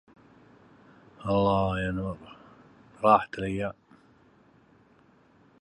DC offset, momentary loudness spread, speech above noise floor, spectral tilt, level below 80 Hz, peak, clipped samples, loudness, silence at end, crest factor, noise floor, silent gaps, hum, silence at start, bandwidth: under 0.1%; 16 LU; 35 dB; -7.5 dB/octave; -52 dBFS; -6 dBFS; under 0.1%; -27 LUFS; 1.9 s; 26 dB; -60 dBFS; none; none; 1.2 s; 11 kHz